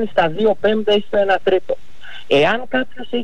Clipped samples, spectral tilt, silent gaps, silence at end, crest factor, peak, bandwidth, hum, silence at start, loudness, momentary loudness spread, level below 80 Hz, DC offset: under 0.1%; -6 dB/octave; none; 0 s; 12 dB; -6 dBFS; 9.2 kHz; none; 0 s; -17 LUFS; 12 LU; -50 dBFS; 6%